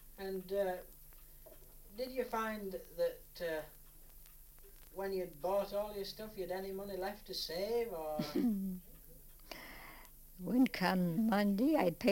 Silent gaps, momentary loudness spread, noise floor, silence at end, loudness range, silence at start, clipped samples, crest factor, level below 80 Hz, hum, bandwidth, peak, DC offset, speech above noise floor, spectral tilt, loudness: none; 25 LU; -57 dBFS; 0 s; 6 LU; 0 s; under 0.1%; 20 dB; -58 dBFS; none; 17 kHz; -18 dBFS; under 0.1%; 20 dB; -6 dB/octave; -38 LUFS